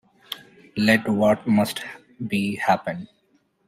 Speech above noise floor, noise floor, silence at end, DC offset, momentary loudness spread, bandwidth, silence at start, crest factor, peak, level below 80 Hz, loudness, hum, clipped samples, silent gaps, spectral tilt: 43 dB; -65 dBFS; 0.6 s; under 0.1%; 17 LU; 16 kHz; 0.3 s; 20 dB; -4 dBFS; -60 dBFS; -22 LUFS; none; under 0.1%; none; -5.5 dB/octave